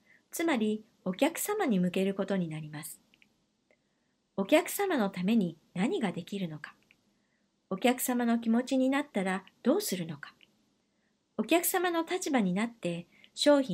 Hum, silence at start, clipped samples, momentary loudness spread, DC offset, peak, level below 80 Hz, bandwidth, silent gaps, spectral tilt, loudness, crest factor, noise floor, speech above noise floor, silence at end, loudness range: none; 0.35 s; under 0.1%; 15 LU; under 0.1%; -10 dBFS; -80 dBFS; 16 kHz; none; -5 dB/octave; -30 LUFS; 20 dB; -76 dBFS; 46 dB; 0 s; 3 LU